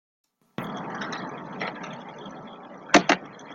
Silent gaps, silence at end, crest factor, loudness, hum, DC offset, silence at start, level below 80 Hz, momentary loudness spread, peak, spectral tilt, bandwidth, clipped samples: none; 0 s; 28 dB; -26 LUFS; none; under 0.1%; 0.6 s; -68 dBFS; 21 LU; -2 dBFS; -3.5 dB/octave; 16.5 kHz; under 0.1%